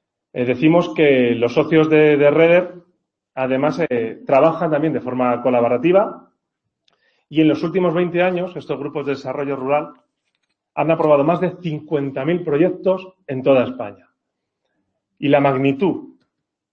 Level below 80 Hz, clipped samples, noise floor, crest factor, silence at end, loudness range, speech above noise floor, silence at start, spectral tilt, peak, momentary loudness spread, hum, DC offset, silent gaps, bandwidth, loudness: -60 dBFS; under 0.1%; -78 dBFS; 18 dB; 0.65 s; 5 LU; 61 dB; 0.35 s; -8 dB/octave; 0 dBFS; 11 LU; none; under 0.1%; none; 6.6 kHz; -17 LUFS